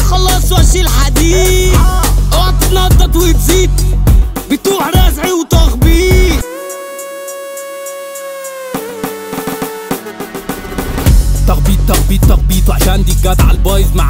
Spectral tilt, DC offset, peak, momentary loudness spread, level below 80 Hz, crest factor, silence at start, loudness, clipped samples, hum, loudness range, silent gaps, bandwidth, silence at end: -5 dB/octave; under 0.1%; 0 dBFS; 14 LU; -12 dBFS; 10 dB; 0 s; -11 LUFS; under 0.1%; none; 11 LU; none; 16.5 kHz; 0 s